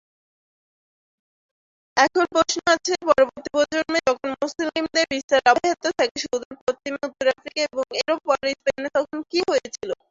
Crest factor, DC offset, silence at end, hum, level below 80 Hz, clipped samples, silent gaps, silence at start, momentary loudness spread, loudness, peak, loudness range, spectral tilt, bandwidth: 20 dB; under 0.1%; 0.15 s; none; -60 dBFS; under 0.1%; 5.24-5.28 s, 6.11-6.15 s, 6.45-6.51 s, 6.61-6.67 s; 1.95 s; 9 LU; -22 LUFS; -2 dBFS; 3 LU; -2 dB/octave; 7.8 kHz